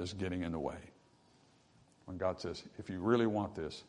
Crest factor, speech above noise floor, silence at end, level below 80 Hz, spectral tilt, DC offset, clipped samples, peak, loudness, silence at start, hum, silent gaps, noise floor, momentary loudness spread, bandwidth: 22 dB; 30 dB; 0.05 s; -66 dBFS; -6.5 dB/octave; under 0.1%; under 0.1%; -16 dBFS; -37 LUFS; 0 s; none; none; -67 dBFS; 16 LU; 10.5 kHz